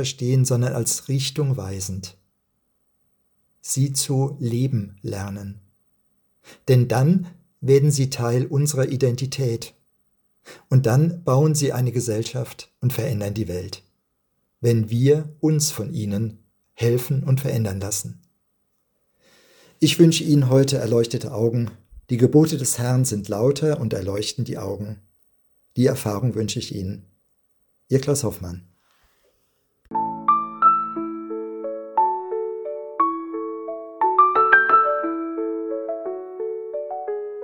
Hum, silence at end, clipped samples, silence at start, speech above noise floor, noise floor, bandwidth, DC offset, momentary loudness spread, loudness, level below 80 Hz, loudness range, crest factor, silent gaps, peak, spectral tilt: none; 0 s; under 0.1%; 0 s; 50 dB; -71 dBFS; 18 kHz; under 0.1%; 14 LU; -21 LUFS; -60 dBFS; 7 LU; 22 dB; none; 0 dBFS; -5.5 dB/octave